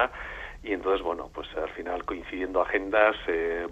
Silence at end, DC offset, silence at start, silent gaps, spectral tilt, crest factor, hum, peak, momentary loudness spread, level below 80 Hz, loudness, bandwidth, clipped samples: 0 s; under 0.1%; 0 s; none; -5.5 dB/octave; 22 dB; none; -8 dBFS; 13 LU; -48 dBFS; -28 LUFS; 8.2 kHz; under 0.1%